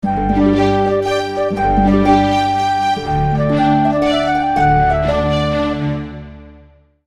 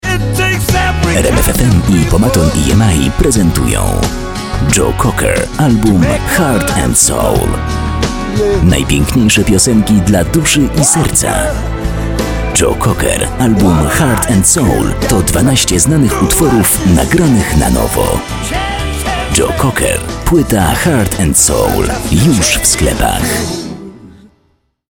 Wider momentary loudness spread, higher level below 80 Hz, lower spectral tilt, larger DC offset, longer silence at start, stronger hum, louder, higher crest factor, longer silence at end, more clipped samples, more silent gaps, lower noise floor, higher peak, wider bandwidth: about the same, 6 LU vs 7 LU; second, -30 dBFS vs -20 dBFS; first, -7 dB/octave vs -4.5 dB/octave; neither; about the same, 0.05 s vs 0.05 s; neither; second, -15 LUFS vs -11 LUFS; about the same, 14 dB vs 10 dB; second, 0.5 s vs 0.8 s; neither; neither; second, -46 dBFS vs -57 dBFS; about the same, 0 dBFS vs 0 dBFS; second, 11.5 kHz vs 19.5 kHz